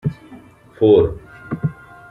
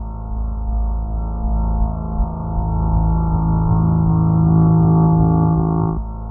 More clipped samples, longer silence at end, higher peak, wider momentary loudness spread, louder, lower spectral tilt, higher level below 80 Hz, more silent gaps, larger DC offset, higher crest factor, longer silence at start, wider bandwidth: neither; first, 0.4 s vs 0 s; about the same, -2 dBFS vs -4 dBFS; first, 21 LU vs 11 LU; about the same, -17 LUFS vs -18 LUFS; second, -10 dB/octave vs -16.5 dB/octave; second, -42 dBFS vs -22 dBFS; neither; neither; about the same, 16 dB vs 12 dB; about the same, 0.05 s vs 0 s; first, 4.1 kHz vs 1.5 kHz